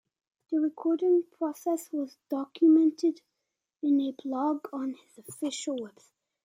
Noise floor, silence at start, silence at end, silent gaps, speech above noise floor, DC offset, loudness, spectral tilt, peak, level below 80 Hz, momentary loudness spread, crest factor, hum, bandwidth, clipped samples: -85 dBFS; 0.5 s; 0.55 s; none; 57 dB; under 0.1%; -29 LUFS; -4.5 dB/octave; -14 dBFS; -88 dBFS; 14 LU; 16 dB; none; 16 kHz; under 0.1%